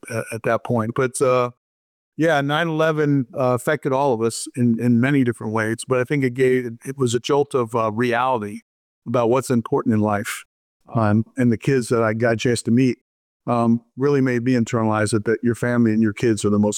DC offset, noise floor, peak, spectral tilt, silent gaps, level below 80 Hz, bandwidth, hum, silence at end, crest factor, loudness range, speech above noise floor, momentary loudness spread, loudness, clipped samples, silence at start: under 0.1%; under -90 dBFS; -8 dBFS; -6 dB/octave; 1.57-2.12 s, 8.62-9.02 s, 10.45-10.80 s, 13.01-13.40 s; -60 dBFS; 15.5 kHz; none; 0 s; 12 dB; 2 LU; over 71 dB; 6 LU; -20 LUFS; under 0.1%; 0.05 s